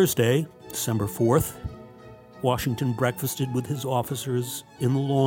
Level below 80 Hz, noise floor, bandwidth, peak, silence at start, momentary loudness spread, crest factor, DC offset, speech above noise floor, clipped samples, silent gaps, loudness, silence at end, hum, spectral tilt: -50 dBFS; -47 dBFS; 17 kHz; -8 dBFS; 0 s; 11 LU; 18 dB; under 0.1%; 22 dB; under 0.1%; none; -26 LUFS; 0 s; none; -5.5 dB/octave